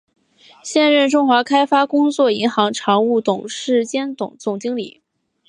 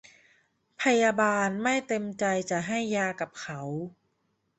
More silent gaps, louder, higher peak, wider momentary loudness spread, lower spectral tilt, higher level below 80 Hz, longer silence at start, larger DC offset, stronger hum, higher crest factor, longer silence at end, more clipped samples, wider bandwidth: neither; first, -17 LUFS vs -28 LUFS; first, -2 dBFS vs -10 dBFS; about the same, 11 LU vs 13 LU; about the same, -4 dB/octave vs -4.5 dB/octave; about the same, -70 dBFS vs -70 dBFS; second, 0.65 s vs 0.8 s; neither; neither; about the same, 16 dB vs 20 dB; about the same, 0.6 s vs 0.7 s; neither; first, 11 kHz vs 8.4 kHz